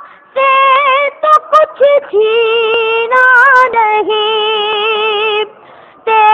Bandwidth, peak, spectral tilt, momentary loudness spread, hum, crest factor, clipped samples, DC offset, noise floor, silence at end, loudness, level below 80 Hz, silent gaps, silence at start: 9 kHz; 0 dBFS; -2 dB/octave; 7 LU; none; 10 dB; 0.2%; under 0.1%; -38 dBFS; 0 s; -9 LUFS; -62 dBFS; none; 0 s